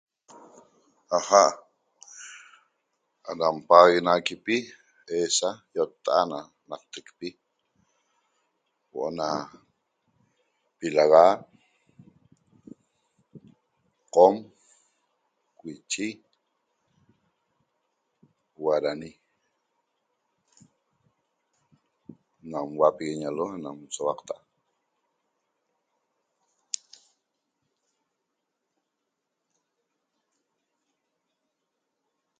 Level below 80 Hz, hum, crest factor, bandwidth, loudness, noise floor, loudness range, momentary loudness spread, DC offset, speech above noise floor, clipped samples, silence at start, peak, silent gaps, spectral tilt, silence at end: -74 dBFS; none; 28 dB; 9.6 kHz; -24 LUFS; -82 dBFS; 20 LU; 25 LU; under 0.1%; 58 dB; under 0.1%; 1.1 s; 0 dBFS; none; -3 dB/octave; 8.05 s